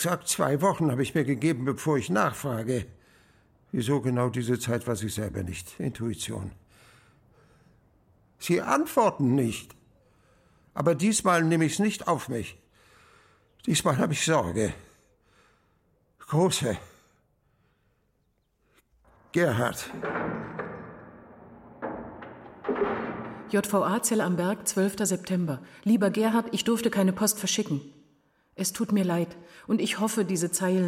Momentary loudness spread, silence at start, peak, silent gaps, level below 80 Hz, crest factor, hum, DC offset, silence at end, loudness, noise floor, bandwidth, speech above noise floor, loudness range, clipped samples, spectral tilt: 13 LU; 0 s; -10 dBFS; none; -60 dBFS; 18 dB; none; under 0.1%; 0 s; -27 LUFS; -72 dBFS; 16.5 kHz; 45 dB; 7 LU; under 0.1%; -5 dB/octave